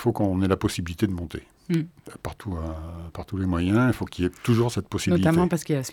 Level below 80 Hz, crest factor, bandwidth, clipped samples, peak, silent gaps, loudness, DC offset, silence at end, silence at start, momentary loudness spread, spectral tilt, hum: -44 dBFS; 20 dB; 17.5 kHz; under 0.1%; -6 dBFS; none; -25 LUFS; under 0.1%; 0 s; 0 s; 16 LU; -6.5 dB/octave; none